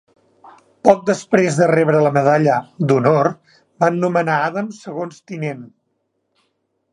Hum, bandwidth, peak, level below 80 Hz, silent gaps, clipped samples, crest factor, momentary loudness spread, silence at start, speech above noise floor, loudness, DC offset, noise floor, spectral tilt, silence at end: none; 11.5 kHz; 0 dBFS; -64 dBFS; none; under 0.1%; 18 dB; 13 LU; 0.45 s; 54 dB; -17 LUFS; under 0.1%; -70 dBFS; -7 dB/octave; 1.25 s